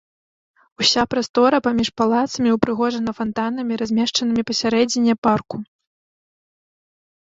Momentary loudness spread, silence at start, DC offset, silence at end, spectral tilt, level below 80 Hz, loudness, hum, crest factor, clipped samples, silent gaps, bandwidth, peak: 7 LU; 0.8 s; under 0.1%; 1.6 s; -4 dB/octave; -54 dBFS; -19 LUFS; none; 18 dB; under 0.1%; 1.29-1.34 s, 5.18-5.22 s; 7.8 kHz; -2 dBFS